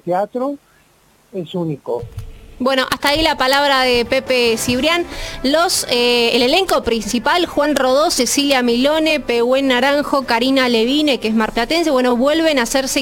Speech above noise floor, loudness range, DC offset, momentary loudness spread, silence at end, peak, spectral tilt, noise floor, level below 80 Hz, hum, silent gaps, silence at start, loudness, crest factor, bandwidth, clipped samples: 38 dB; 3 LU; under 0.1%; 10 LU; 0 s; 0 dBFS; -3 dB/octave; -53 dBFS; -40 dBFS; none; none; 0.05 s; -15 LUFS; 16 dB; 17 kHz; under 0.1%